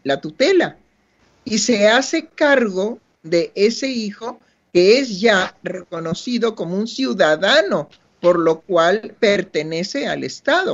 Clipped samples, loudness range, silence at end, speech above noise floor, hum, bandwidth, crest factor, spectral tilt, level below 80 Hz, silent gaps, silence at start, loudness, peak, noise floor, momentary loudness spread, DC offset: under 0.1%; 1 LU; 0 s; 41 dB; none; 8 kHz; 18 dB; -4 dB/octave; -62 dBFS; none; 0.05 s; -18 LUFS; 0 dBFS; -59 dBFS; 12 LU; under 0.1%